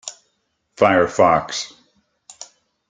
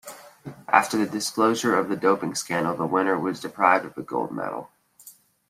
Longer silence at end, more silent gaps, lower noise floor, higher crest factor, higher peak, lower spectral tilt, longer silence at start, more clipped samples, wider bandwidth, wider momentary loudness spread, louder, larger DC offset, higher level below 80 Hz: about the same, 0.45 s vs 0.4 s; neither; first, -70 dBFS vs -51 dBFS; about the same, 20 dB vs 24 dB; about the same, -2 dBFS vs -2 dBFS; about the same, -4 dB/octave vs -4 dB/octave; about the same, 0.05 s vs 0.05 s; neither; second, 9.6 kHz vs 16 kHz; first, 24 LU vs 14 LU; first, -17 LUFS vs -24 LUFS; neither; first, -56 dBFS vs -68 dBFS